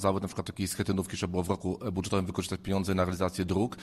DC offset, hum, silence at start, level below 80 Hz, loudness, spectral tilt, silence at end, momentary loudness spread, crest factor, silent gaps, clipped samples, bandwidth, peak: under 0.1%; none; 0 s; -52 dBFS; -31 LUFS; -5.5 dB/octave; 0 s; 5 LU; 18 dB; none; under 0.1%; 13 kHz; -12 dBFS